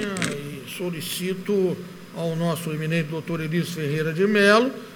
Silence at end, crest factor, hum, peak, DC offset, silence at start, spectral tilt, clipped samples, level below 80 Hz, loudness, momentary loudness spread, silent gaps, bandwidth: 0 s; 18 dB; none; -4 dBFS; under 0.1%; 0 s; -5.5 dB/octave; under 0.1%; -64 dBFS; -24 LUFS; 13 LU; none; over 20 kHz